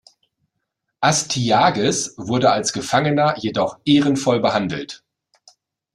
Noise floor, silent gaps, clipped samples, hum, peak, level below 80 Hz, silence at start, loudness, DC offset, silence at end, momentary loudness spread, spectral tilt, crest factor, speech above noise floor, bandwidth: -77 dBFS; none; under 0.1%; none; -2 dBFS; -56 dBFS; 1 s; -18 LUFS; under 0.1%; 1 s; 7 LU; -4 dB/octave; 18 dB; 59 dB; 13 kHz